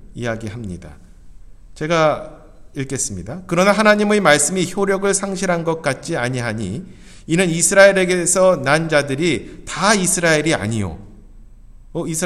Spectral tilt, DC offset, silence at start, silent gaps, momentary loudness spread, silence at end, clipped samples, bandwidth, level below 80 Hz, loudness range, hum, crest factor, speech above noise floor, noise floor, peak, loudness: -4 dB/octave; under 0.1%; 0 s; none; 16 LU; 0 s; under 0.1%; 14.5 kHz; -42 dBFS; 5 LU; none; 18 dB; 23 dB; -40 dBFS; 0 dBFS; -17 LUFS